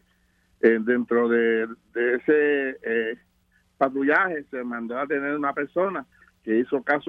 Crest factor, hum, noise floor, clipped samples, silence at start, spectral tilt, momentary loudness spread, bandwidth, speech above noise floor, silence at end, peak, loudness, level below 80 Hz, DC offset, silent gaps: 20 dB; none; -65 dBFS; under 0.1%; 0.65 s; -8 dB/octave; 11 LU; 4.7 kHz; 42 dB; 0 s; -4 dBFS; -24 LUFS; -70 dBFS; under 0.1%; none